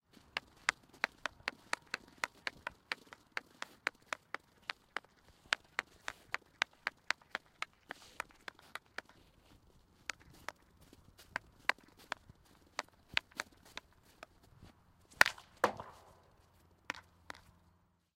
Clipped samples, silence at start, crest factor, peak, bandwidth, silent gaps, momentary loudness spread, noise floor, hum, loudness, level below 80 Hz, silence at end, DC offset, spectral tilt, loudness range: under 0.1%; 0.35 s; 42 dB; -2 dBFS; 16 kHz; none; 15 LU; -72 dBFS; none; -41 LUFS; -72 dBFS; 1.15 s; under 0.1%; -1 dB/octave; 9 LU